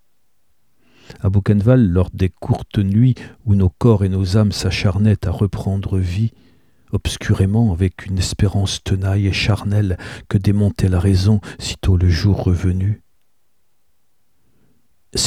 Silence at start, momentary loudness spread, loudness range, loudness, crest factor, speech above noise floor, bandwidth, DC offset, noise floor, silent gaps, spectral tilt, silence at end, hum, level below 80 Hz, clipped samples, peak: 1.25 s; 8 LU; 3 LU; -18 LUFS; 16 dB; 53 dB; 12.5 kHz; 0.2%; -69 dBFS; none; -6.5 dB/octave; 0 s; none; -34 dBFS; under 0.1%; -2 dBFS